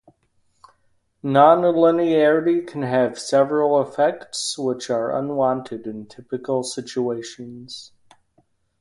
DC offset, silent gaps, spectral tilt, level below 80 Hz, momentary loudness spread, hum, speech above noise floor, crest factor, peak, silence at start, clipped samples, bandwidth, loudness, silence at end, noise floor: under 0.1%; none; -5 dB/octave; -66 dBFS; 19 LU; none; 45 dB; 20 dB; 0 dBFS; 1.25 s; under 0.1%; 11.5 kHz; -20 LUFS; 0.95 s; -65 dBFS